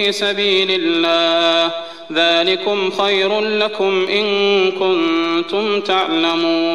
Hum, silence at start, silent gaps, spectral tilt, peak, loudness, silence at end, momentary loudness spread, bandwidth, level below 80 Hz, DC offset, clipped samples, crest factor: none; 0 s; none; -3.5 dB/octave; -4 dBFS; -15 LUFS; 0 s; 5 LU; 12 kHz; -62 dBFS; 0.5%; under 0.1%; 12 dB